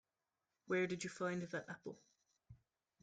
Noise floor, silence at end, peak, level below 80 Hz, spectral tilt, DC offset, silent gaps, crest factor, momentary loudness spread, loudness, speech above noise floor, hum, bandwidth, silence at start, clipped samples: under -90 dBFS; 0.45 s; -28 dBFS; -80 dBFS; -5 dB/octave; under 0.1%; none; 18 dB; 14 LU; -43 LUFS; over 47 dB; none; 9.4 kHz; 0.65 s; under 0.1%